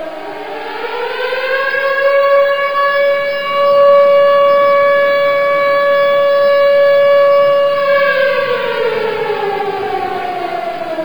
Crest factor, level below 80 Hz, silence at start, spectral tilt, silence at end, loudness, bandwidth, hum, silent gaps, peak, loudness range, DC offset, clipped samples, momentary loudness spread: 12 dB; -58 dBFS; 0 s; -4.5 dB/octave; 0 s; -12 LUFS; 19.5 kHz; none; none; 0 dBFS; 4 LU; 2%; under 0.1%; 11 LU